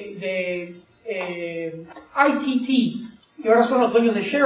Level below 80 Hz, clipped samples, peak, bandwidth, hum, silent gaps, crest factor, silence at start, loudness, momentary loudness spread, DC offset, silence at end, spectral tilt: -66 dBFS; under 0.1%; -2 dBFS; 4 kHz; none; none; 20 dB; 0 s; -22 LUFS; 17 LU; under 0.1%; 0 s; -9.5 dB/octave